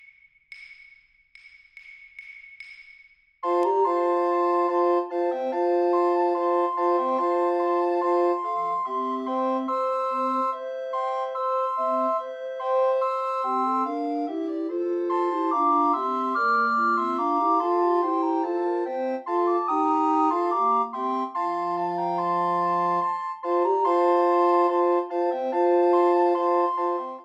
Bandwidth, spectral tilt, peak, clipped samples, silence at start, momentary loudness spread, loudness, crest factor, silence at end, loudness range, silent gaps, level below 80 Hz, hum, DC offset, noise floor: 7.8 kHz; -6.5 dB/octave; -10 dBFS; under 0.1%; 0.5 s; 7 LU; -24 LUFS; 14 dB; 0 s; 4 LU; none; -82 dBFS; none; under 0.1%; -56 dBFS